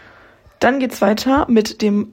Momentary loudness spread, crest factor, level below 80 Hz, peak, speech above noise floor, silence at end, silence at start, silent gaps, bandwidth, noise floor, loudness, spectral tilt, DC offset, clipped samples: 4 LU; 14 dB; -42 dBFS; -4 dBFS; 32 dB; 0 s; 0.6 s; none; 16.5 kHz; -47 dBFS; -16 LUFS; -5.5 dB/octave; under 0.1%; under 0.1%